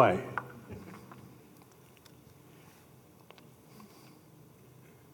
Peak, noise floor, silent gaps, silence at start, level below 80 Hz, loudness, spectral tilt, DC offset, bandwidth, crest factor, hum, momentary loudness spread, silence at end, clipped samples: -8 dBFS; -58 dBFS; none; 0 s; -74 dBFS; -36 LUFS; -6.5 dB/octave; under 0.1%; 19 kHz; 30 dB; none; 17 LU; 1.3 s; under 0.1%